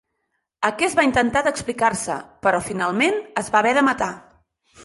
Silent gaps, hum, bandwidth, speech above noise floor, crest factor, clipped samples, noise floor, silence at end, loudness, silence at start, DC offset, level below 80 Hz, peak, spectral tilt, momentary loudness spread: none; none; 11.5 kHz; 54 dB; 18 dB; under 0.1%; -75 dBFS; 0 s; -20 LUFS; 0.6 s; under 0.1%; -52 dBFS; -4 dBFS; -3.5 dB/octave; 8 LU